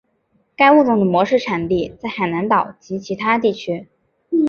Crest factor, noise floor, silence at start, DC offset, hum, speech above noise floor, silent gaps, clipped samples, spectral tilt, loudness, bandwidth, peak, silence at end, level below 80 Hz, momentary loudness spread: 16 dB; -63 dBFS; 0.6 s; under 0.1%; none; 46 dB; none; under 0.1%; -7 dB/octave; -17 LUFS; 7 kHz; -2 dBFS; 0 s; -52 dBFS; 14 LU